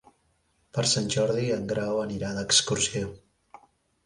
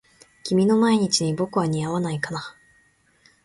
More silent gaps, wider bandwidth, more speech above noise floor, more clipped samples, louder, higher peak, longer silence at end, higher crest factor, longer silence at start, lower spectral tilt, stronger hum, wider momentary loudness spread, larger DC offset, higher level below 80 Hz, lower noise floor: neither; about the same, 11.5 kHz vs 11.5 kHz; first, 43 dB vs 39 dB; neither; second, -26 LUFS vs -22 LUFS; about the same, -6 dBFS vs -8 dBFS; about the same, 0.9 s vs 0.95 s; first, 22 dB vs 16 dB; first, 0.75 s vs 0.45 s; second, -3 dB/octave vs -5 dB/octave; neither; second, 11 LU vs 14 LU; neither; about the same, -56 dBFS vs -60 dBFS; first, -69 dBFS vs -61 dBFS